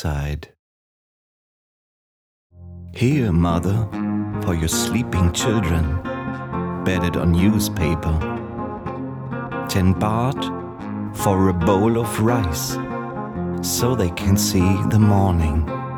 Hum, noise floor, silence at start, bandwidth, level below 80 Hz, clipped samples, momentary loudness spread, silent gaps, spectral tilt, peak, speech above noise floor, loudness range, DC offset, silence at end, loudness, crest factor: none; under -90 dBFS; 0 s; 19 kHz; -34 dBFS; under 0.1%; 11 LU; 0.59-2.50 s; -6 dB/octave; -2 dBFS; over 71 dB; 4 LU; under 0.1%; 0 s; -21 LUFS; 18 dB